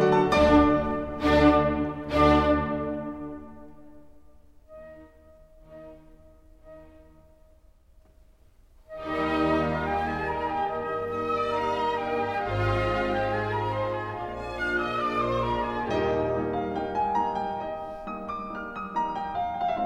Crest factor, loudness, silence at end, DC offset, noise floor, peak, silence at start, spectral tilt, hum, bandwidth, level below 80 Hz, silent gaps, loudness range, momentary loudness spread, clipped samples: 22 dB; -26 LUFS; 0 s; under 0.1%; -57 dBFS; -6 dBFS; 0 s; -7 dB/octave; none; 10.5 kHz; -42 dBFS; none; 8 LU; 15 LU; under 0.1%